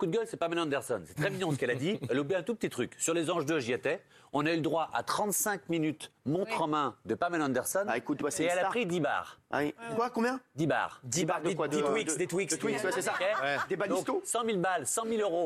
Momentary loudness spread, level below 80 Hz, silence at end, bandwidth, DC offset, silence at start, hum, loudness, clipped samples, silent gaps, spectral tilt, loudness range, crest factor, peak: 4 LU; -72 dBFS; 0 s; 14.5 kHz; under 0.1%; 0 s; none; -32 LUFS; under 0.1%; none; -4 dB/octave; 1 LU; 18 dB; -14 dBFS